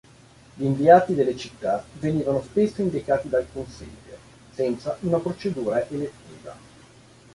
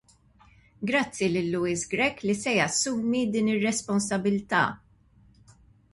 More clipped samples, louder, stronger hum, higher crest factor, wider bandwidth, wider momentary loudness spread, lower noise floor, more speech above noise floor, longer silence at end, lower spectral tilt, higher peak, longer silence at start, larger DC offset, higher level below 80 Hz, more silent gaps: neither; first, -23 LUFS vs -26 LUFS; neither; about the same, 22 dB vs 20 dB; about the same, 11.5 kHz vs 11.5 kHz; first, 25 LU vs 4 LU; second, -51 dBFS vs -59 dBFS; second, 28 dB vs 33 dB; second, 0.75 s vs 1.2 s; first, -7.5 dB/octave vs -4 dB/octave; first, -2 dBFS vs -8 dBFS; second, 0.55 s vs 0.8 s; neither; first, -54 dBFS vs -60 dBFS; neither